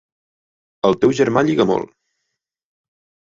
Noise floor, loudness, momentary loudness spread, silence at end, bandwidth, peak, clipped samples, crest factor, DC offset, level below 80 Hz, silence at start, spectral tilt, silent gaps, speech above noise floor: -78 dBFS; -17 LUFS; 7 LU; 1.4 s; 7.8 kHz; -2 dBFS; under 0.1%; 18 dB; under 0.1%; -56 dBFS; 0.85 s; -6.5 dB/octave; none; 62 dB